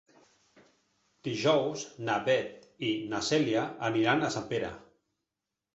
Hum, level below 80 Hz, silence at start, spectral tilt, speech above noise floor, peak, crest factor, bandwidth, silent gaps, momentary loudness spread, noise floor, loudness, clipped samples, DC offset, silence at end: none; -66 dBFS; 1.25 s; -4.5 dB/octave; 58 dB; -12 dBFS; 20 dB; 8.2 kHz; none; 11 LU; -88 dBFS; -30 LUFS; under 0.1%; under 0.1%; 0.95 s